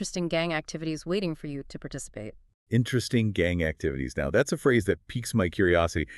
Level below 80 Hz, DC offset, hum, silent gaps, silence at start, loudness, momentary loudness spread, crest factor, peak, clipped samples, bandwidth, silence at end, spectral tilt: -46 dBFS; under 0.1%; none; 2.54-2.66 s; 0 s; -27 LUFS; 14 LU; 18 dB; -8 dBFS; under 0.1%; 12 kHz; 0 s; -5.5 dB/octave